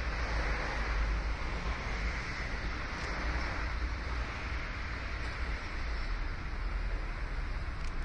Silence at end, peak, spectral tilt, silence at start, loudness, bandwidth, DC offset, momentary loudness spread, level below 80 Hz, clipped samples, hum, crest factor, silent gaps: 0 s; -20 dBFS; -5 dB/octave; 0 s; -37 LUFS; 9.2 kHz; under 0.1%; 5 LU; -36 dBFS; under 0.1%; none; 14 dB; none